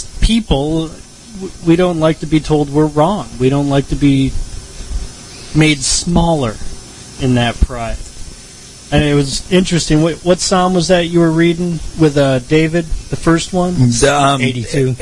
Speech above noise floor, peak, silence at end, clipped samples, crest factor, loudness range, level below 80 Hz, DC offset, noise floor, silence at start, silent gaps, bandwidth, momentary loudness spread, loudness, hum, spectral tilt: 22 dB; 0 dBFS; 0 s; under 0.1%; 14 dB; 4 LU; -26 dBFS; under 0.1%; -35 dBFS; 0 s; none; 11.5 kHz; 18 LU; -14 LUFS; none; -5 dB/octave